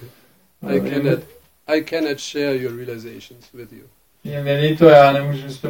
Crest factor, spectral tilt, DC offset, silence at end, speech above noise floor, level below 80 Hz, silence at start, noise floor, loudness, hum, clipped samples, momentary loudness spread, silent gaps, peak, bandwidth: 18 dB; -6.5 dB/octave; under 0.1%; 0 s; 37 dB; -54 dBFS; 0 s; -55 dBFS; -17 LUFS; none; under 0.1%; 22 LU; none; 0 dBFS; 17 kHz